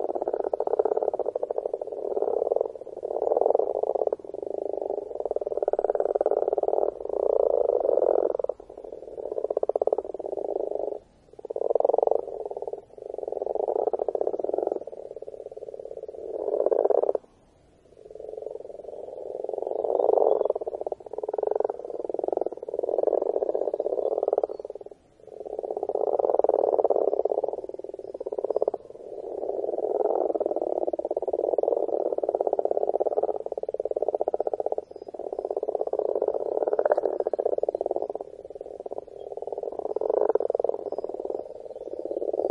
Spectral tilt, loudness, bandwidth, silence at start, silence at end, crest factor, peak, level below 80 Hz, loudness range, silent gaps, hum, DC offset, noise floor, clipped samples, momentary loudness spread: -8 dB/octave; -28 LUFS; 5.2 kHz; 0 s; 0 s; 22 dB; -6 dBFS; -66 dBFS; 4 LU; none; none; under 0.1%; -59 dBFS; under 0.1%; 15 LU